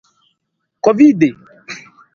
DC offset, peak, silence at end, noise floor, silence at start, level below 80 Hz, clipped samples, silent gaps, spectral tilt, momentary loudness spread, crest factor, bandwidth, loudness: under 0.1%; 0 dBFS; 0.35 s; -73 dBFS; 0.85 s; -62 dBFS; under 0.1%; none; -7 dB/octave; 21 LU; 16 dB; 7 kHz; -12 LUFS